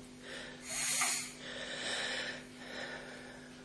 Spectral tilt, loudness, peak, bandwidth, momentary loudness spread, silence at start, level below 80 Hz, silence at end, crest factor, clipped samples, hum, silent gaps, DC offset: -0.5 dB/octave; -37 LUFS; -20 dBFS; 11 kHz; 16 LU; 0 s; -68 dBFS; 0 s; 20 dB; under 0.1%; none; none; under 0.1%